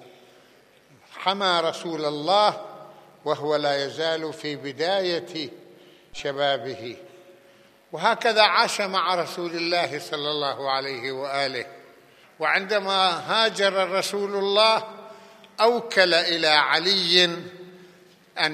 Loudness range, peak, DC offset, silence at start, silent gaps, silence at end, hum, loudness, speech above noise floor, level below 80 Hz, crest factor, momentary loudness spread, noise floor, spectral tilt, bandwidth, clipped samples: 7 LU; -2 dBFS; under 0.1%; 0 s; none; 0 s; none; -22 LUFS; 32 dB; -72 dBFS; 24 dB; 17 LU; -56 dBFS; -3 dB/octave; 15 kHz; under 0.1%